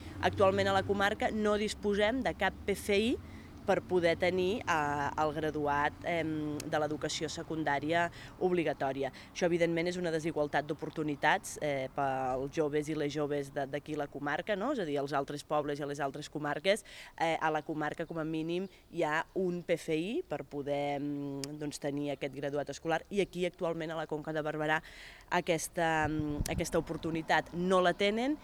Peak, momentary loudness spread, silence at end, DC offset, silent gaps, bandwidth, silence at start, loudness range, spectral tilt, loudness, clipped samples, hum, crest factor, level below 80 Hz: -12 dBFS; 7 LU; 0 s; under 0.1%; none; over 20 kHz; 0 s; 4 LU; -5 dB/octave; -33 LUFS; under 0.1%; none; 20 dB; -56 dBFS